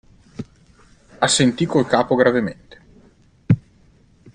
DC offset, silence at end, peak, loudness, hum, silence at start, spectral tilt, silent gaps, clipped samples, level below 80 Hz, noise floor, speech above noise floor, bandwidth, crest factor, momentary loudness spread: under 0.1%; 0.75 s; -2 dBFS; -18 LUFS; none; 0.4 s; -4.5 dB/octave; none; under 0.1%; -52 dBFS; -53 dBFS; 36 dB; 10.5 kHz; 20 dB; 21 LU